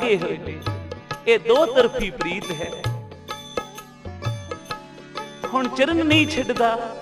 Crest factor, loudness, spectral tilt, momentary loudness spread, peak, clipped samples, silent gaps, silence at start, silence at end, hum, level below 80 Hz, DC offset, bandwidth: 20 dB; -22 LUFS; -5 dB/octave; 17 LU; -4 dBFS; under 0.1%; none; 0 s; 0 s; none; -46 dBFS; under 0.1%; 14.5 kHz